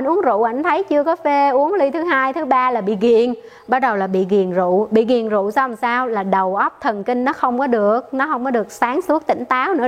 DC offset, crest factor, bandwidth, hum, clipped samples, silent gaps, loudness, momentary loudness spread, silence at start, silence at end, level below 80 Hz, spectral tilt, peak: under 0.1%; 16 dB; 15 kHz; none; under 0.1%; none; -17 LUFS; 4 LU; 0 s; 0 s; -62 dBFS; -6.5 dB/octave; -2 dBFS